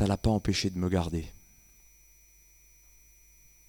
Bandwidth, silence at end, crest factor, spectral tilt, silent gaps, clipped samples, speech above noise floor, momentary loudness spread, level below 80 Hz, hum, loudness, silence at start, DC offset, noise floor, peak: 19 kHz; 2.35 s; 20 dB; -6 dB/octave; none; under 0.1%; 31 dB; 10 LU; -46 dBFS; none; -30 LUFS; 0 s; under 0.1%; -59 dBFS; -14 dBFS